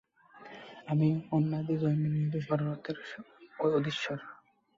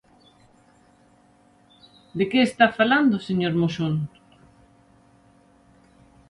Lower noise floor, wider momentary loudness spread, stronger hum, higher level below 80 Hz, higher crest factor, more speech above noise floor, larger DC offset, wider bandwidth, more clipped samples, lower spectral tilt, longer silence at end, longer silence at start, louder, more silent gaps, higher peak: about the same, -54 dBFS vs -57 dBFS; first, 19 LU vs 10 LU; neither; second, -70 dBFS vs -62 dBFS; second, 16 dB vs 24 dB; second, 23 dB vs 37 dB; neither; second, 7.4 kHz vs 11.5 kHz; neither; first, -8 dB/octave vs -6.5 dB/octave; second, 0.45 s vs 2.2 s; second, 0.35 s vs 2.15 s; second, -32 LUFS vs -21 LUFS; neither; second, -16 dBFS vs -2 dBFS